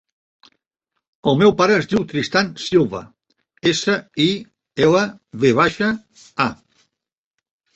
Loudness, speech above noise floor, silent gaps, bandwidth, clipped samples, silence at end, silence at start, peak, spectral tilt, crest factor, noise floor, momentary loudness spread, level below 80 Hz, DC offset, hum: -18 LUFS; 66 dB; none; 8.2 kHz; under 0.1%; 1.2 s; 1.25 s; -2 dBFS; -5 dB/octave; 18 dB; -84 dBFS; 10 LU; -54 dBFS; under 0.1%; none